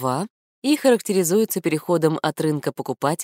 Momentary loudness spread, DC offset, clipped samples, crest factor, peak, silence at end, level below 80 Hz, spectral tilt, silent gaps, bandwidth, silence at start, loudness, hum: 9 LU; under 0.1%; under 0.1%; 16 dB; -4 dBFS; 0 s; -70 dBFS; -5 dB/octave; 0.30-0.62 s; 16 kHz; 0 s; -21 LUFS; none